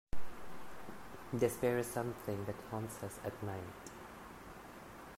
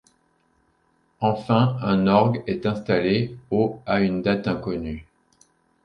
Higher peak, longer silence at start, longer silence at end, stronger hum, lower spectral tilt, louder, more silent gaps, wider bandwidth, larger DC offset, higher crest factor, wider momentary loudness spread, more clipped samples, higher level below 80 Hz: second, -20 dBFS vs -4 dBFS; second, 0.15 s vs 1.2 s; second, 0 s vs 0.8 s; neither; second, -6 dB/octave vs -8.5 dB/octave; second, -41 LUFS vs -22 LUFS; neither; first, 16 kHz vs 6.4 kHz; neither; about the same, 20 dB vs 20 dB; first, 17 LU vs 9 LU; neither; second, -58 dBFS vs -50 dBFS